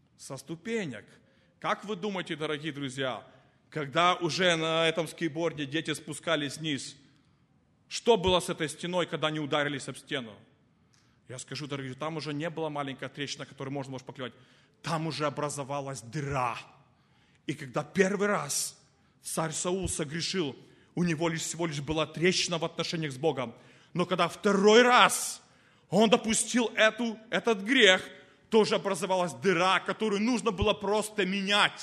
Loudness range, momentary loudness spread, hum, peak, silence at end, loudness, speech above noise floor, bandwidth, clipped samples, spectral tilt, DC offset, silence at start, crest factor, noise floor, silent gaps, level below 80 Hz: 11 LU; 14 LU; none; -4 dBFS; 0 s; -29 LUFS; 38 dB; 13 kHz; under 0.1%; -3.5 dB/octave; under 0.1%; 0.2 s; 24 dB; -67 dBFS; none; -58 dBFS